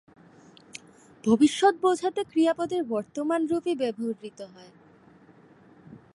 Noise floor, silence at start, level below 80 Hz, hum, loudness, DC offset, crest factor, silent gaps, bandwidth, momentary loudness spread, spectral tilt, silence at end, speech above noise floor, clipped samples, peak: -55 dBFS; 0.75 s; -68 dBFS; none; -25 LUFS; under 0.1%; 18 dB; none; 11.5 kHz; 23 LU; -5 dB/octave; 0.15 s; 30 dB; under 0.1%; -8 dBFS